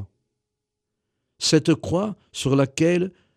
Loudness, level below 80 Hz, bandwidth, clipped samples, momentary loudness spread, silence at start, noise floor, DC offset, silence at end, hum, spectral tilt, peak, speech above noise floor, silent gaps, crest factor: -22 LUFS; -56 dBFS; 13.5 kHz; under 0.1%; 7 LU; 0 s; -82 dBFS; under 0.1%; 0.25 s; none; -5 dB/octave; -6 dBFS; 61 dB; none; 18 dB